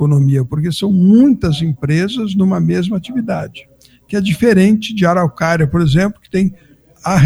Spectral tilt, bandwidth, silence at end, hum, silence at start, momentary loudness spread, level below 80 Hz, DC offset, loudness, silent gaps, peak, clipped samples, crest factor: -7 dB/octave; 13.5 kHz; 0 s; none; 0 s; 10 LU; -38 dBFS; under 0.1%; -14 LUFS; none; 0 dBFS; under 0.1%; 14 dB